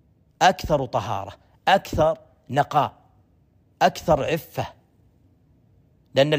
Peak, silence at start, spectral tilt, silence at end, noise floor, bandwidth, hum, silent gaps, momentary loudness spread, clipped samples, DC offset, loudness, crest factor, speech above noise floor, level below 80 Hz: -4 dBFS; 0.4 s; -5 dB/octave; 0 s; -60 dBFS; 15.5 kHz; none; none; 12 LU; under 0.1%; under 0.1%; -23 LUFS; 20 dB; 38 dB; -46 dBFS